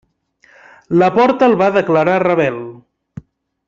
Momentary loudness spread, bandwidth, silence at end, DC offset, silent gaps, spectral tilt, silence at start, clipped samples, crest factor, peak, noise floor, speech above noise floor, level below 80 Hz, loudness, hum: 8 LU; 7.6 kHz; 0.9 s; under 0.1%; none; -7.5 dB/octave; 0.9 s; under 0.1%; 14 dB; -2 dBFS; -53 dBFS; 40 dB; -56 dBFS; -13 LUFS; none